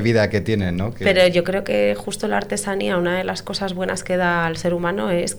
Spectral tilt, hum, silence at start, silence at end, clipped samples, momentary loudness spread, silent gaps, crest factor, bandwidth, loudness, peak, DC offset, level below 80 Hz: -5 dB/octave; none; 0 s; 0 s; under 0.1%; 8 LU; none; 14 dB; over 20 kHz; -20 LUFS; -6 dBFS; under 0.1%; -46 dBFS